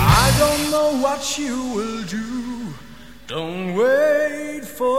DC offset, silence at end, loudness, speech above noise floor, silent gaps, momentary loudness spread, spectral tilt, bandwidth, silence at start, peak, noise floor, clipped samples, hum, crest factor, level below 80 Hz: 0.7%; 0 s; -20 LUFS; 21 dB; none; 14 LU; -4.5 dB/octave; 16.5 kHz; 0 s; -2 dBFS; -42 dBFS; under 0.1%; none; 18 dB; -34 dBFS